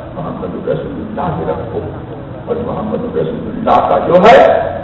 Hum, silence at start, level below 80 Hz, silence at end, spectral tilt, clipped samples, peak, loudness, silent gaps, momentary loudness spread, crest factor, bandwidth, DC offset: none; 0 s; -38 dBFS; 0 s; -7.5 dB/octave; 0.3%; 0 dBFS; -13 LUFS; none; 17 LU; 14 dB; 7.8 kHz; under 0.1%